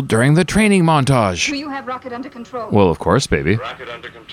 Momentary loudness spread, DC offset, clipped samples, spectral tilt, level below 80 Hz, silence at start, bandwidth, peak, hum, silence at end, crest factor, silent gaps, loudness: 16 LU; under 0.1%; under 0.1%; -5.5 dB/octave; -38 dBFS; 0 s; 14 kHz; -2 dBFS; none; 0 s; 16 dB; none; -16 LUFS